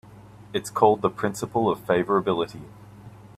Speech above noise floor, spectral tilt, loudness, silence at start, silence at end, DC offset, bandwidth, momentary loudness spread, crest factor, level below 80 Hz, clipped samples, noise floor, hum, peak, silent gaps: 23 dB; -5.5 dB/octave; -24 LUFS; 0.1 s; 0.3 s; under 0.1%; 14.5 kHz; 12 LU; 22 dB; -58 dBFS; under 0.1%; -46 dBFS; none; -4 dBFS; none